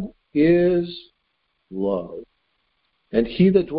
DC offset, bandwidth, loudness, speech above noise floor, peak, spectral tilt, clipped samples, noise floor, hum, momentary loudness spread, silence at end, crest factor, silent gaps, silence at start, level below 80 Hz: under 0.1%; 5.2 kHz; -21 LUFS; 52 dB; -4 dBFS; -12 dB/octave; under 0.1%; -71 dBFS; none; 20 LU; 0 s; 18 dB; none; 0 s; -48 dBFS